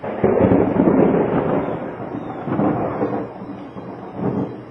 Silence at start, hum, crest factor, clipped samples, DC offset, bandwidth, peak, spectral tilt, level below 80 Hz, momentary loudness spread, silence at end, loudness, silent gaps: 0 s; none; 18 dB; under 0.1%; under 0.1%; 5.6 kHz; -2 dBFS; -11 dB/octave; -46 dBFS; 17 LU; 0 s; -19 LUFS; none